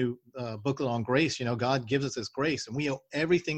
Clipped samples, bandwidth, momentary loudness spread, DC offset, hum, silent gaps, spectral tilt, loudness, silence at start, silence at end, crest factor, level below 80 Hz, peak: under 0.1%; 9.4 kHz; 7 LU; under 0.1%; none; none; -5.5 dB/octave; -30 LUFS; 0 s; 0 s; 18 dB; -62 dBFS; -12 dBFS